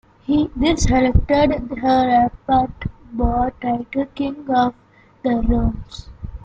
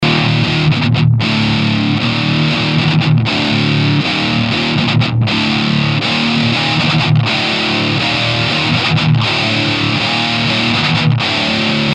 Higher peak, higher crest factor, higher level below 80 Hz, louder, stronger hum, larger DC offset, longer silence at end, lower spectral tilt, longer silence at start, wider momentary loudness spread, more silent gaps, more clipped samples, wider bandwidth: about the same, -2 dBFS vs 0 dBFS; about the same, 16 dB vs 12 dB; first, -28 dBFS vs -40 dBFS; second, -19 LUFS vs -13 LUFS; neither; neither; about the same, 0.05 s vs 0 s; about the same, -6 dB/octave vs -5.5 dB/octave; first, 0.3 s vs 0 s; first, 11 LU vs 1 LU; neither; neither; about the same, 9 kHz vs 9.4 kHz